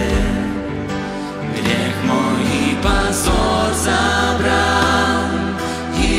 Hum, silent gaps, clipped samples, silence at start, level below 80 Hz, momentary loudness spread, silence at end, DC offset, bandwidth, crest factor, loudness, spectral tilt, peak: none; none; under 0.1%; 0 s; -26 dBFS; 9 LU; 0 s; under 0.1%; 16 kHz; 14 dB; -17 LUFS; -4.5 dB/octave; -2 dBFS